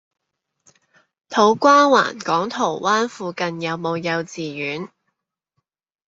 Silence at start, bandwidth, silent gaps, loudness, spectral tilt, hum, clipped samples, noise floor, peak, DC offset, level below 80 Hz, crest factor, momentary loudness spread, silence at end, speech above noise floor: 1.3 s; 7.8 kHz; none; -19 LUFS; -4 dB/octave; none; under 0.1%; -76 dBFS; -2 dBFS; under 0.1%; -68 dBFS; 20 dB; 14 LU; 1.2 s; 58 dB